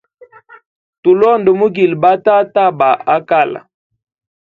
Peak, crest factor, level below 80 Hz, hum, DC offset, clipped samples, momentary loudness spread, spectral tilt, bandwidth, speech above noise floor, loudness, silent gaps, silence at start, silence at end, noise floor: 0 dBFS; 14 dB; -58 dBFS; none; under 0.1%; under 0.1%; 5 LU; -8.5 dB/octave; 4.8 kHz; 32 dB; -12 LUFS; none; 1.05 s; 0.95 s; -43 dBFS